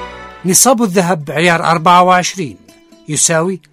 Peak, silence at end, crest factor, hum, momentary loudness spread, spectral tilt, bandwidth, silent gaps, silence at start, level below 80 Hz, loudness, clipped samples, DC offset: 0 dBFS; 0.15 s; 12 dB; none; 14 LU; -3 dB/octave; over 20 kHz; none; 0 s; -50 dBFS; -11 LUFS; 0.2%; under 0.1%